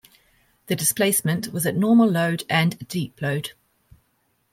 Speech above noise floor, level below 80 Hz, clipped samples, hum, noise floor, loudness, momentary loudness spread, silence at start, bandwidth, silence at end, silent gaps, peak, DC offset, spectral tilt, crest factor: 47 dB; -62 dBFS; under 0.1%; none; -68 dBFS; -22 LUFS; 12 LU; 0.7 s; 16.5 kHz; 1 s; none; -6 dBFS; under 0.1%; -4.5 dB/octave; 18 dB